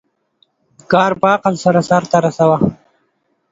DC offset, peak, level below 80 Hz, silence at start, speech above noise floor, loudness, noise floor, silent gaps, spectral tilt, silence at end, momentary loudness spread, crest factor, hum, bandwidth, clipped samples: under 0.1%; 0 dBFS; -52 dBFS; 0.9 s; 51 dB; -14 LUFS; -64 dBFS; none; -6.5 dB/octave; 0.8 s; 3 LU; 16 dB; none; 7.8 kHz; under 0.1%